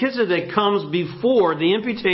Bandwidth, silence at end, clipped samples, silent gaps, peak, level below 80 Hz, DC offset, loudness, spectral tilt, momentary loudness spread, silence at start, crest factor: 5.8 kHz; 0 s; under 0.1%; none; -6 dBFS; -60 dBFS; under 0.1%; -20 LUFS; -10.5 dB/octave; 4 LU; 0 s; 14 dB